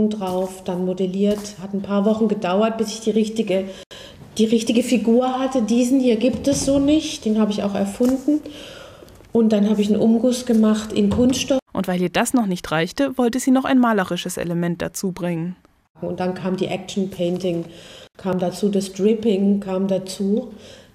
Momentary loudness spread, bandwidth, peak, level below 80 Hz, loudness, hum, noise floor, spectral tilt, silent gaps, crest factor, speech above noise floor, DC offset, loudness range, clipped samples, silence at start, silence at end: 10 LU; 15.5 kHz; -4 dBFS; -50 dBFS; -20 LUFS; none; -43 dBFS; -5.5 dB/octave; 3.86-3.91 s, 11.62-11.66 s, 15.90-15.95 s; 16 dB; 24 dB; under 0.1%; 6 LU; under 0.1%; 0 s; 0.15 s